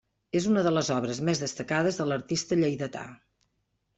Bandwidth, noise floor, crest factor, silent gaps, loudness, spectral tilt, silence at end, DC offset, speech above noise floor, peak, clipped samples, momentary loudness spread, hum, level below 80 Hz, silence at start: 8.4 kHz; -76 dBFS; 16 dB; none; -28 LUFS; -5 dB/octave; 0.85 s; under 0.1%; 49 dB; -12 dBFS; under 0.1%; 10 LU; none; -64 dBFS; 0.35 s